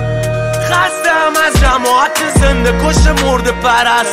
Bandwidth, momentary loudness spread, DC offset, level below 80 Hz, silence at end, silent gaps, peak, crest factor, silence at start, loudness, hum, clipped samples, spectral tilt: 16 kHz; 4 LU; under 0.1%; -18 dBFS; 0 s; none; 0 dBFS; 10 dB; 0 s; -11 LUFS; none; under 0.1%; -4 dB/octave